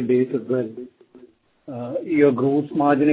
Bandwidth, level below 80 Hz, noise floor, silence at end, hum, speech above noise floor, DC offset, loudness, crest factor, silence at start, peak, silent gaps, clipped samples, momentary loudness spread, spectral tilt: 4 kHz; -66 dBFS; -52 dBFS; 0 s; none; 32 dB; under 0.1%; -21 LUFS; 16 dB; 0 s; -4 dBFS; none; under 0.1%; 18 LU; -12 dB/octave